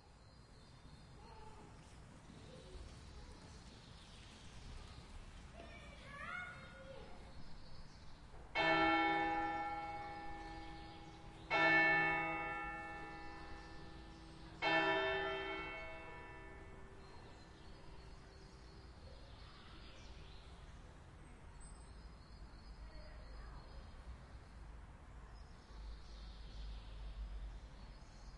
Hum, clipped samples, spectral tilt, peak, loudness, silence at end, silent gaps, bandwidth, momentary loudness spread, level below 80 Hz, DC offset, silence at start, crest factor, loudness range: none; under 0.1%; -5 dB/octave; -20 dBFS; -39 LUFS; 0 s; none; 11 kHz; 24 LU; -56 dBFS; under 0.1%; 0 s; 24 dB; 21 LU